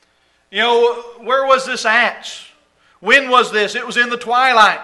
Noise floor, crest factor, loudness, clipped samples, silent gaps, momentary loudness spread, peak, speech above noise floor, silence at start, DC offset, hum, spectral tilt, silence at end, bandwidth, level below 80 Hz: -58 dBFS; 16 dB; -14 LUFS; under 0.1%; none; 15 LU; 0 dBFS; 44 dB; 0.55 s; under 0.1%; none; -1.5 dB/octave; 0 s; 11.5 kHz; -62 dBFS